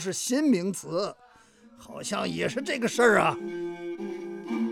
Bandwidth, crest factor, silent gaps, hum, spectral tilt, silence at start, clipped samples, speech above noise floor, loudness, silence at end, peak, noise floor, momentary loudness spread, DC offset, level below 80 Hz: 17 kHz; 20 dB; none; none; -4 dB/octave; 0 s; under 0.1%; 29 dB; -27 LUFS; 0 s; -8 dBFS; -56 dBFS; 15 LU; under 0.1%; -66 dBFS